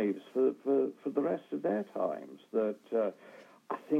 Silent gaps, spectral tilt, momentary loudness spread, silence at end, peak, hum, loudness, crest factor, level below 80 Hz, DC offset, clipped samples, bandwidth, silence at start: none; -8.5 dB/octave; 10 LU; 0 s; -16 dBFS; none; -34 LUFS; 16 dB; under -90 dBFS; under 0.1%; under 0.1%; 7.2 kHz; 0 s